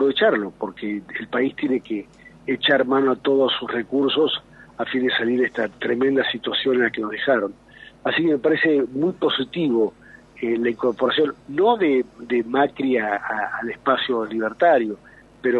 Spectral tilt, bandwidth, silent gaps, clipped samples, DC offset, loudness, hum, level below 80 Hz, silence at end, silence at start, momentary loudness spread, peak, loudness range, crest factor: -6.5 dB/octave; 6.8 kHz; none; under 0.1%; under 0.1%; -21 LUFS; none; -60 dBFS; 0 s; 0 s; 10 LU; -4 dBFS; 1 LU; 18 dB